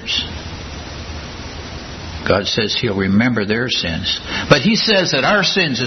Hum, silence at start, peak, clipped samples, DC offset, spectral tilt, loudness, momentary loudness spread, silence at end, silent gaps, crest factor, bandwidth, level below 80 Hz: none; 0 s; 0 dBFS; under 0.1%; under 0.1%; -4.5 dB/octave; -16 LUFS; 16 LU; 0 s; none; 18 dB; 6.4 kHz; -38 dBFS